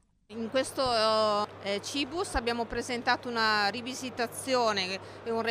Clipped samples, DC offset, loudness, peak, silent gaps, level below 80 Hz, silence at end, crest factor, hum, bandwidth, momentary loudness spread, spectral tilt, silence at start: under 0.1%; under 0.1%; -30 LUFS; -14 dBFS; none; -52 dBFS; 0 s; 18 dB; none; 15.5 kHz; 9 LU; -3 dB/octave; 0.3 s